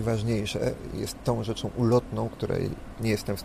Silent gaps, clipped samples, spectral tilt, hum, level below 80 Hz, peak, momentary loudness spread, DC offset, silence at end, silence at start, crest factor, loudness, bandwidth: none; under 0.1%; -6.5 dB/octave; none; -44 dBFS; -10 dBFS; 8 LU; under 0.1%; 0 s; 0 s; 18 dB; -29 LUFS; 15.5 kHz